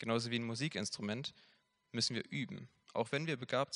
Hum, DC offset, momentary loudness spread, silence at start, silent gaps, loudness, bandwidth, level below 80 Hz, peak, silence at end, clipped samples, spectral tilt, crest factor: none; under 0.1%; 10 LU; 0 s; none; -39 LUFS; 10.5 kHz; -82 dBFS; -20 dBFS; 0 s; under 0.1%; -4 dB/octave; 20 dB